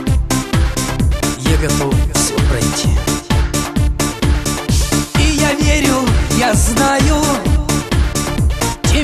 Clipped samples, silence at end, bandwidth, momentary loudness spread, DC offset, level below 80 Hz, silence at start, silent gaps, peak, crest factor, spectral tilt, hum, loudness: under 0.1%; 0 s; 14 kHz; 4 LU; under 0.1%; -18 dBFS; 0 s; none; 0 dBFS; 14 dB; -4.5 dB/octave; none; -15 LUFS